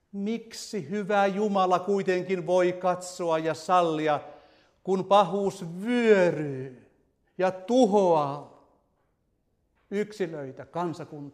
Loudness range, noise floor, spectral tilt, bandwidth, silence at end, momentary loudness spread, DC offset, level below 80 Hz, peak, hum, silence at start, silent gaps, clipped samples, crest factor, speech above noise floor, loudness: 3 LU; -73 dBFS; -6 dB/octave; 14 kHz; 0.05 s; 13 LU; under 0.1%; -72 dBFS; -8 dBFS; none; 0.15 s; none; under 0.1%; 20 dB; 47 dB; -26 LUFS